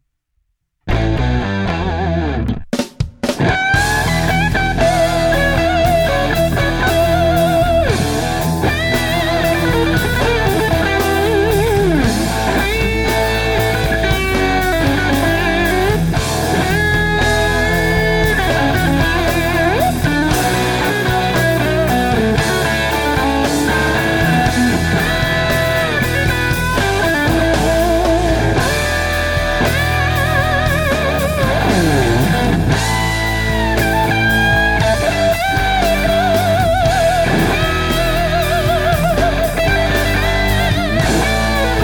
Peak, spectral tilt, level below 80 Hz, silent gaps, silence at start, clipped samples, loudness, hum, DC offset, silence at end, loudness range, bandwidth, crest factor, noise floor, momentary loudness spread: -4 dBFS; -5 dB/octave; -24 dBFS; none; 0.85 s; under 0.1%; -15 LUFS; none; under 0.1%; 0 s; 1 LU; over 20 kHz; 10 dB; -66 dBFS; 3 LU